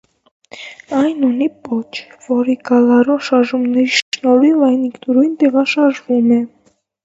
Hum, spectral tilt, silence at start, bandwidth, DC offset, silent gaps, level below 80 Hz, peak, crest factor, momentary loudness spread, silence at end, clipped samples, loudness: none; -4.5 dB/octave; 0.55 s; 7.8 kHz; under 0.1%; 4.02-4.12 s; -66 dBFS; 0 dBFS; 14 dB; 11 LU; 0.6 s; under 0.1%; -14 LUFS